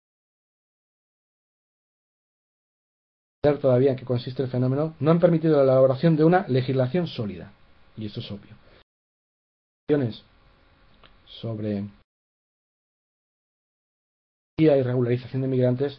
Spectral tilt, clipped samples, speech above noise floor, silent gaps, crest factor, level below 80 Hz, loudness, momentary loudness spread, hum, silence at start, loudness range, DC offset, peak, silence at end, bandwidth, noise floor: -11 dB/octave; under 0.1%; 35 dB; 8.83-9.87 s, 12.04-14.57 s; 20 dB; -60 dBFS; -23 LUFS; 17 LU; none; 3.45 s; 16 LU; under 0.1%; -6 dBFS; 0.05 s; 5.6 kHz; -57 dBFS